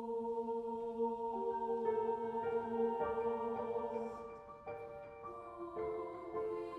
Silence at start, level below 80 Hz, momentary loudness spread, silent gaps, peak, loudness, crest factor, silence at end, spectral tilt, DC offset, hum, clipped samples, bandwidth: 0 s; -70 dBFS; 13 LU; none; -24 dBFS; -40 LUFS; 16 dB; 0 s; -7.5 dB/octave; under 0.1%; none; under 0.1%; 5.8 kHz